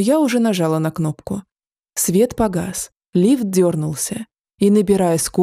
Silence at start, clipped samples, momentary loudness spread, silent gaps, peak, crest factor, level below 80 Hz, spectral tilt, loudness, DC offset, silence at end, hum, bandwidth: 0 s; under 0.1%; 12 LU; 1.72-1.76 s, 3.06-3.10 s; -4 dBFS; 14 dB; -48 dBFS; -5.5 dB/octave; -18 LUFS; under 0.1%; 0 s; none; 16 kHz